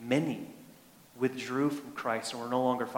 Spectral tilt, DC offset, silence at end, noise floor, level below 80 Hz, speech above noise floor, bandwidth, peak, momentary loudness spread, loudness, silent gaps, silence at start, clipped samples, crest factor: -5.5 dB/octave; under 0.1%; 0 s; -57 dBFS; -76 dBFS; 25 dB; 17 kHz; -14 dBFS; 10 LU; -33 LUFS; none; 0 s; under 0.1%; 18 dB